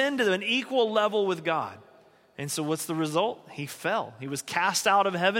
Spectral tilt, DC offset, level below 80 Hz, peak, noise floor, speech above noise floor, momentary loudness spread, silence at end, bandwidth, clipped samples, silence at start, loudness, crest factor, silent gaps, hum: -3.5 dB/octave; under 0.1%; -76 dBFS; -8 dBFS; -58 dBFS; 31 dB; 12 LU; 0 s; 17 kHz; under 0.1%; 0 s; -27 LUFS; 18 dB; none; none